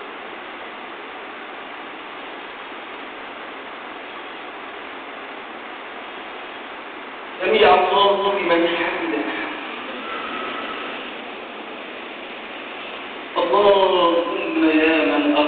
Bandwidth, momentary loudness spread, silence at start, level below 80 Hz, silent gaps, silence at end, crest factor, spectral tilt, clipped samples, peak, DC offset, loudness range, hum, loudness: 4.6 kHz; 17 LU; 0 s; -58 dBFS; none; 0 s; 18 dB; -1 dB/octave; under 0.1%; -4 dBFS; under 0.1%; 14 LU; none; -20 LUFS